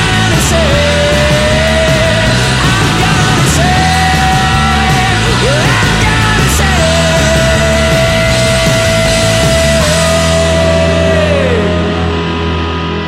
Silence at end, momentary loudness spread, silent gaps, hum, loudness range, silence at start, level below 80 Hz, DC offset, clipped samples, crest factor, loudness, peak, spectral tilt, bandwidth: 0 s; 2 LU; none; none; 1 LU; 0 s; -20 dBFS; 0.3%; under 0.1%; 10 dB; -9 LUFS; 0 dBFS; -4.5 dB/octave; 16.5 kHz